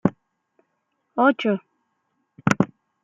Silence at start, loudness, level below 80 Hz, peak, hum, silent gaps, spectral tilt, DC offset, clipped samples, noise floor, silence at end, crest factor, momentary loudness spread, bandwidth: 0.05 s; -23 LUFS; -58 dBFS; -2 dBFS; none; none; -6.5 dB/octave; under 0.1%; under 0.1%; -74 dBFS; 0.4 s; 24 dB; 9 LU; 12 kHz